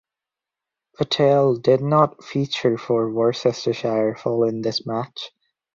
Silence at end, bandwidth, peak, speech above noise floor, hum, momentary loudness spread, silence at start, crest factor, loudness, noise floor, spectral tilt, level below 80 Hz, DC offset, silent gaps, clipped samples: 0.5 s; 7.6 kHz; -4 dBFS; 67 dB; none; 11 LU; 1 s; 18 dB; -21 LUFS; -87 dBFS; -6.5 dB/octave; -62 dBFS; under 0.1%; none; under 0.1%